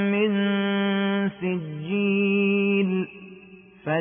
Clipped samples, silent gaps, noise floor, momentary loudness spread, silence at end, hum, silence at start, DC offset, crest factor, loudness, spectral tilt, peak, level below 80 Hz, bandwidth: under 0.1%; none; -48 dBFS; 12 LU; 0 s; none; 0 s; under 0.1%; 12 dB; -24 LUFS; -11 dB/octave; -12 dBFS; -68 dBFS; 3.6 kHz